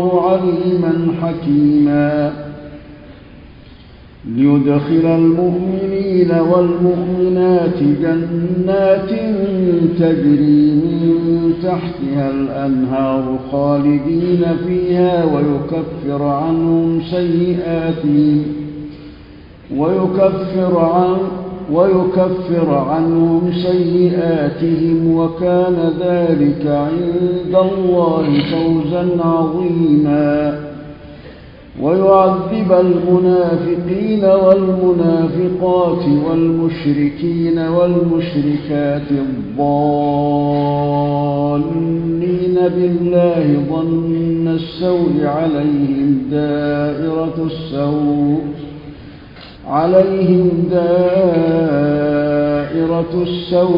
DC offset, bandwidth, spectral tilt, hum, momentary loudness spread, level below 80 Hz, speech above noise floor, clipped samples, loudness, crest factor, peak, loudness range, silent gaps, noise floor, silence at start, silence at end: under 0.1%; 5.4 kHz; -11.5 dB/octave; none; 7 LU; -42 dBFS; 25 dB; under 0.1%; -15 LUFS; 14 dB; 0 dBFS; 3 LU; none; -39 dBFS; 0 s; 0 s